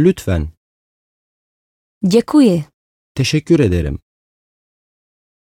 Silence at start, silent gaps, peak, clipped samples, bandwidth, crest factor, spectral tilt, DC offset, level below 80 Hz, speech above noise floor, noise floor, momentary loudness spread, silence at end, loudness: 0 s; 0.57-2.01 s, 2.74-3.15 s; 0 dBFS; under 0.1%; 16.5 kHz; 18 dB; -6.5 dB/octave; under 0.1%; -36 dBFS; over 76 dB; under -90 dBFS; 17 LU; 1.5 s; -15 LUFS